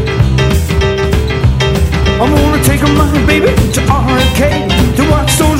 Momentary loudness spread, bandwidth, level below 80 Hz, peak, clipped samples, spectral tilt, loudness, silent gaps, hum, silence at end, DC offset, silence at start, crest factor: 3 LU; 16.5 kHz; -16 dBFS; 0 dBFS; under 0.1%; -5.5 dB/octave; -10 LUFS; none; none; 0 s; under 0.1%; 0 s; 10 dB